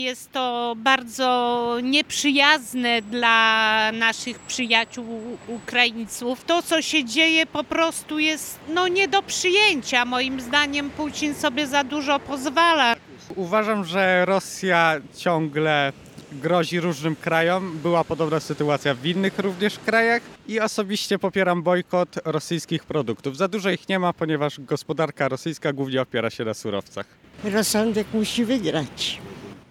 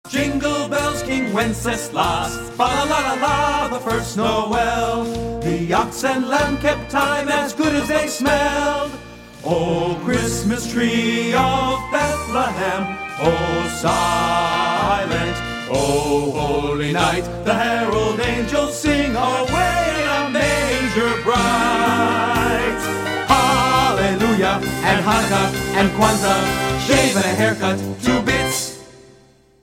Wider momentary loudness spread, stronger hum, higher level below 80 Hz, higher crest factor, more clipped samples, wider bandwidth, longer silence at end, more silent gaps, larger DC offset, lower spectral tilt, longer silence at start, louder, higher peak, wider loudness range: first, 11 LU vs 6 LU; neither; second, -60 dBFS vs -36 dBFS; about the same, 22 dB vs 18 dB; neither; about the same, 17.5 kHz vs 16.5 kHz; second, 0.1 s vs 0.65 s; neither; neither; about the same, -3.5 dB/octave vs -4 dB/octave; about the same, 0 s vs 0.05 s; second, -22 LUFS vs -18 LUFS; about the same, -2 dBFS vs 0 dBFS; first, 6 LU vs 3 LU